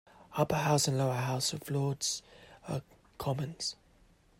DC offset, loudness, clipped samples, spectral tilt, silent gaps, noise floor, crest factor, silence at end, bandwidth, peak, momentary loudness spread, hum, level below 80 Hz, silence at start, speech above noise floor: under 0.1%; -33 LUFS; under 0.1%; -4.5 dB/octave; none; -64 dBFS; 20 dB; 0.65 s; 16 kHz; -14 dBFS; 12 LU; none; -64 dBFS; 0.2 s; 32 dB